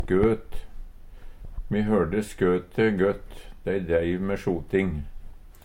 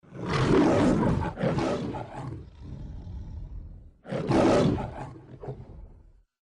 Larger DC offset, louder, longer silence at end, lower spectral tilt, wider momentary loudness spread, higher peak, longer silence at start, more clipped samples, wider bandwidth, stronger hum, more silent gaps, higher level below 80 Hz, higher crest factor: neither; about the same, -26 LUFS vs -26 LUFS; second, 0.05 s vs 0.55 s; about the same, -7.5 dB/octave vs -7 dB/octave; about the same, 21 LU vs 21 LU; about the same, -10 dBFS vs -10 dBFS; about the same, 0 s vs 0.1 s; neither; first, 16 kHz vs 10.5 kHz; neither; neither; about the same, -38 dBFS vs -42 dBFS; about the same, 16 dB vs 18 dB